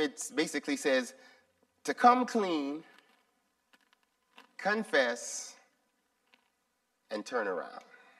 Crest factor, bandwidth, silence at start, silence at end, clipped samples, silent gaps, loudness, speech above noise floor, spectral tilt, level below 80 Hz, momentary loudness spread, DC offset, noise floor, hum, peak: 24 dB; 14 kHz; 0 s; 0.4 s; under 0.1%; none; -31 LUFS; 48 dB; -3 dB/octave; -88 dBFS; 19 LU; under 0.1%; -79 dBFS; none; -10 dBFS